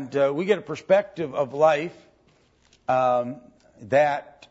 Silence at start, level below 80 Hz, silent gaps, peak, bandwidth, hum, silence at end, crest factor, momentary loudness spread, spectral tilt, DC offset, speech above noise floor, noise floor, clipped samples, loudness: 0 s; -68 dBFS; none; -6 dBFS; 8 kHz; none; 0.2 s; 18 dB; 13 LU; -6 dB/octave; under 0.1%; 38 dB; -61 dBFS; under 0.1%; -23 LUFS